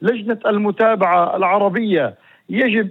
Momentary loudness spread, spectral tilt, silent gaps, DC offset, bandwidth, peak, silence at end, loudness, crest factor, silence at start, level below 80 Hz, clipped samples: 5 LU; -8.5 dB/octave; none; under 0.1%; 4.2 kHz; -4 dBFS; 0 s; -17 LUFS; 14 dB; 0 s; -78 dBFS; under 0.1%